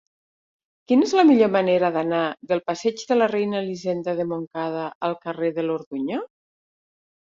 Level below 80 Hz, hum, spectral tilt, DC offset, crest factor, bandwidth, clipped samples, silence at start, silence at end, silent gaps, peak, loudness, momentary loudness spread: -70 dBFS; none; -6 dB/octave; under 0.1%; 18 dB; 7.6 kHz; under 0.1%; 0.9 s; 1.05 s; 4.47-4.51 s, 4.95-5.01 s, 5.86-5.91 s; -4 dBFS; -22 LUFS; 12 LU